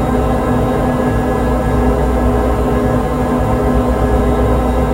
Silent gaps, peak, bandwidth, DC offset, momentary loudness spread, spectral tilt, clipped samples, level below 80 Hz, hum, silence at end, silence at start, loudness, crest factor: none; 0 dBFS; 16 kHz; under 0.1%; 1 LU; -8 dB/octave; under 0.1%; -18 dBFS; none; 0 s; 0 s; -15 LUFS; 12 dB